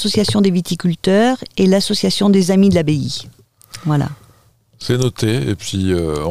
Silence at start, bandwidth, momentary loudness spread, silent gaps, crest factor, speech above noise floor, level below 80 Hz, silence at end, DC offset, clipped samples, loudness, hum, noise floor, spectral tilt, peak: 0 s; 15 kHz; 11 LU; none; 14 dB; 37 dB; -44 dBFS; 0 s; 1%; under 0.1%; -16 LUFS; none; -52 dBFS; -6 dB/octave; -2 dBFS